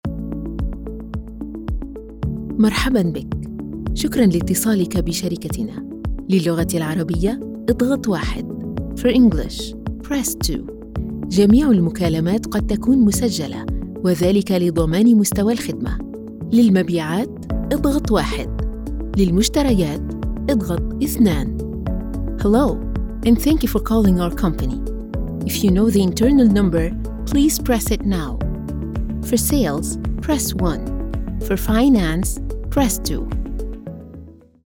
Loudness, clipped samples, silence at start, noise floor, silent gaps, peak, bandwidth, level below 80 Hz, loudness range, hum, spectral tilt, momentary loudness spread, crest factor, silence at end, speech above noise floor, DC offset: -19 LUFS; under 0.1%; 0.05 s; -40 dBFS; none; -2 dBFS; 18 kHz; -28 dBFS; 4 LU; none; -6 dB/octave; 13 LU; 16 dB; 0.35 s; 23 dB; under 0.1%